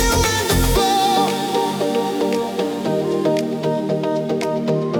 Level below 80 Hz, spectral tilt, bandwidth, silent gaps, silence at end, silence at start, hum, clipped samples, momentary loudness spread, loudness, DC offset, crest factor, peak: -30 dBFS; -4.5 dB/octave; over 20 kHz; none; 0 s; 0 s; none; under 0.1%; 5 LU; -19 LUFS; under 0.1%; 14 dB; -4 dBFS